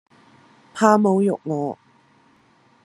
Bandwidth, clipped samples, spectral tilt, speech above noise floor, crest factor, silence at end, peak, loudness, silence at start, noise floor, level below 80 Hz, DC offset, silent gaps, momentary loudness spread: 12 kHz; under 0.1%; -6.5 dB/octave; 39 dB; 22 dB; 1.1 s; 0 dBFS; -20 LUFS; 0.75 s; -57 dBFS; -72 dBFS; under 0.1%; none; 20 LU